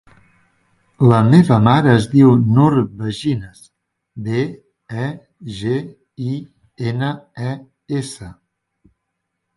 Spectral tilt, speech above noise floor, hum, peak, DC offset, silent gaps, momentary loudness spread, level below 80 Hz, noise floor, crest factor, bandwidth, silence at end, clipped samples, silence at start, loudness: -8 dB/octave; 60 dB; none; 0 dBFS; under 0.1%; none; 19 LU; -50 dBFS; -75 dBFS; 18 dB; 11.5 kHz; 1.25 s; under 0.1%; 1 s; -16 LUFS